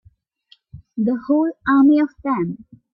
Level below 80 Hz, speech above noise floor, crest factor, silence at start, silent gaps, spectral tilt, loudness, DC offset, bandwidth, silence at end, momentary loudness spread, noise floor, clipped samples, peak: -56 dBFS; 39 dB; 14 dB; 0.75 s; none; -10 dB/octave; -18 LUFS; under 0.1%; 5 kHz; 0.4 s; 14 LU; -56 dBFS; under 0.1%; -6 dBFS